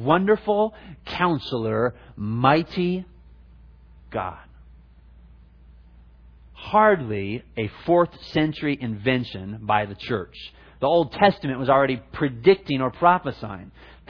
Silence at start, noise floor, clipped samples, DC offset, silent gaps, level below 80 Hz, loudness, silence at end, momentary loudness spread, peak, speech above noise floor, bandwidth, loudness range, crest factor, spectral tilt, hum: 0 s; -49 dBFS; under 0.1%; under 0.1%; none; -50 dBFS; -23 LUFS; 0.4 s; 15 LU; -2 dBFS; 27 dB; 5.4 kHz; 11 LU; 22 dB; -8.5 dB/octave; none